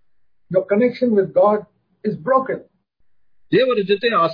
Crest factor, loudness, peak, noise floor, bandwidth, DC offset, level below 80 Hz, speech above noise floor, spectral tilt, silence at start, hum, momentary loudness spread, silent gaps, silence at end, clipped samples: 16 dB; -18 LUFS; -2 dBFS; -68 dBFS; 5.2 kHz; under 0.1%; -66 dBFS; 51 dB; -8.5 dB/octave; 0.5 s; none; 11 LU; none; 0 s; under 0.1%